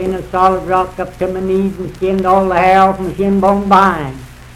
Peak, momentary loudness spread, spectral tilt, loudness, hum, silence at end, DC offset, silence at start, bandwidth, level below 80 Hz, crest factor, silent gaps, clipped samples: 0 dBFS; 11 LU; -7 dB/octave; -13 LUFS; none; 0 s; under 0.1%; 0 s; 14 kHz; -34 dBFS; 14 dB; none; 0.5%